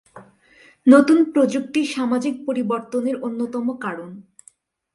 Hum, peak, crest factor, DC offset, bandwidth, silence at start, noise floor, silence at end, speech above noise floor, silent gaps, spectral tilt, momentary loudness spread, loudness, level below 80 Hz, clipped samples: none; 0 dBFS; 20 dB; under 0.1%; 11.5 kHz; 0.15 s; -55 dBFS; 0.75 s; 36 dB; none; -5.5 dB/octave; 14 LU; -19 LUFS; -68 dBFS; under 0.1%